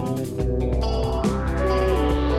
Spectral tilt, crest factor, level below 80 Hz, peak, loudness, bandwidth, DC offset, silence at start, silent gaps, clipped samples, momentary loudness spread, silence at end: -7 dB/octave; 14 dB; -26 dBFS; -8 dBFS; -23 LUFS; 14 kHz; under 0.1%; 0 s; none; under 0.1%; 5 LU; 0 s